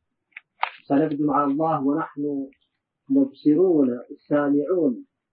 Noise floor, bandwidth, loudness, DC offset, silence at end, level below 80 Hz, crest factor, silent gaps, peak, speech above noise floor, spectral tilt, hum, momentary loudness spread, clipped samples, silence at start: -49 dBFS; 4.6 kHz; -23 LUFS; under 0.1%; 0.3 s; -72 dBFS; 18 dB; none; -4 dBFS; 27 dB; -12 dB/octave; none; 11 LU; under 0.1%; 0.6 s